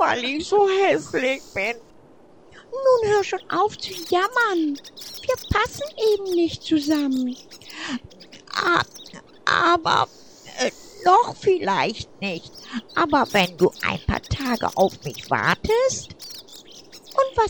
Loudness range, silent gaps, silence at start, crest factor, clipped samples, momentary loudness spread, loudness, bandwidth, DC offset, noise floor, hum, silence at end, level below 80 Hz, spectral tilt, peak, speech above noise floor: 3 LU; none; 0 s; 18 dB; under 0.1%; 16 LU; -22 LUFS; over 20 kHz; 0.2%; -51 dBFS; none; 0 s; -46 dBFS; -4 dB/octave; -6 dBFS; 29 dB